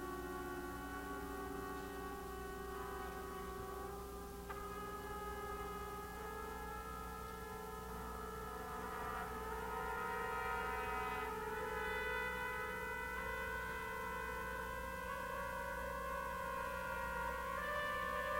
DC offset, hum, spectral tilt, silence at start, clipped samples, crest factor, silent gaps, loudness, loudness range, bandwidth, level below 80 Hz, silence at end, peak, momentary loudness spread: under 0.1%; none; -4.5 dB/octave; 0 s; under 0.1%; 16 dB; none; -44 LUFS; 5 LU; 16 kHz; -56 dBFS; 0 s; -28 dBFS; 7 LU